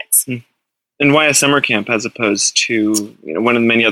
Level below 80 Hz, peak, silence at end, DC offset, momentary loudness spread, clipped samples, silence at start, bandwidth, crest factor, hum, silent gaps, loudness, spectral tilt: -56 dBFS; 0 dBFS; 0 s; under 0.1%; 9 LU; under 0.1%; 0.1 s; 18 kHz; 16 dB; none; none; -14 LUFS; -2.5 dB/octave